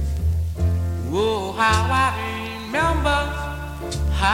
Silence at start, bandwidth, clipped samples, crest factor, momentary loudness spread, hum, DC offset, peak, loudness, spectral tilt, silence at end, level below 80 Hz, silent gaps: 0 s; 16 kHz; under 0.1%; 16 dB; 10 LU; none; under 0.1%; -4 dBFS; -22 LUFS; -5 dB/octave; 0 s; -28 dBFS; none